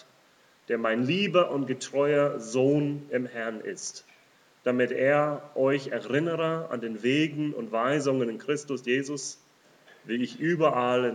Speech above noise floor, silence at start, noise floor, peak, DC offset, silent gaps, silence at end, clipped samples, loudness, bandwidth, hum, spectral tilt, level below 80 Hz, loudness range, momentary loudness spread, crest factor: 34 dB; 0.7 s; -61 dBFS; -10 dBFS; under 0.1%; none; 0 s; under 0.1%; -27 LUFS; 11 kHz; none; -5 dB/octave; -88 dBFS; 2 LU; 10 LU; 18 dB